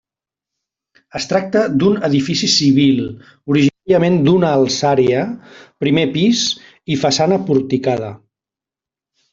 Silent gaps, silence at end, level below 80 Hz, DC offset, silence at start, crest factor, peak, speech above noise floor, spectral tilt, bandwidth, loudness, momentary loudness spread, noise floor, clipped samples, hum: none; 1.15 s; -54 dBFS; under 0.1%; 1.15 s; 14 dB; -2 dBFS; 74 dB; -5 dB/octave; 7.8 kHz; -15 LUFS; 12 LU; -88 dBFS; under 0.1%; none